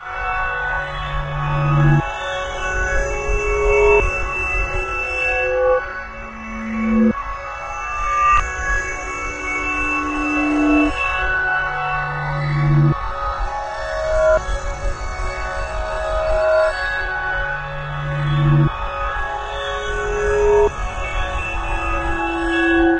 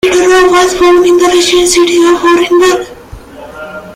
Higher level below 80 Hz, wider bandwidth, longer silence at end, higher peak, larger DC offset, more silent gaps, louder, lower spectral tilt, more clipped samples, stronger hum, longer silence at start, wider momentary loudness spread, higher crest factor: first, -28 dBFS vs -36 dBFS; second, 8.6 kHz vs 15.5 kHz; about the same, 0 s vs 0 s; about the same, -2 dBFS vs 0 dBFS; neither; neither; second, -19 LUFS vs -7 LUFS; first, -6 dB/octave vs -2.5 dB/octave; neither; neither; about the same, 0 s vs 0.05 s; second, 10 LU vs 18 LU; first, 16 dB vs 8 dB